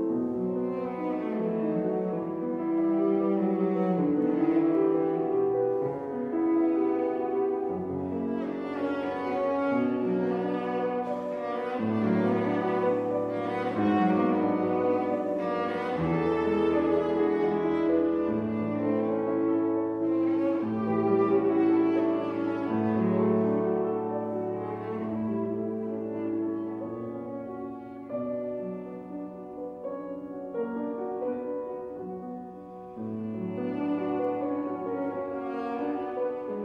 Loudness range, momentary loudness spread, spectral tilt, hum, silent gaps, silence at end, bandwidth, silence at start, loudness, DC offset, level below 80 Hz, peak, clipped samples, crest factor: 9 LU; 11 LU; -9.5 dB/octave; none; none; 0 s; 5.6 kHz; 0 s; -28 LUFS; under 0.1%; -64 dBFS; -12 dBFS; under 0.1%; 16 dB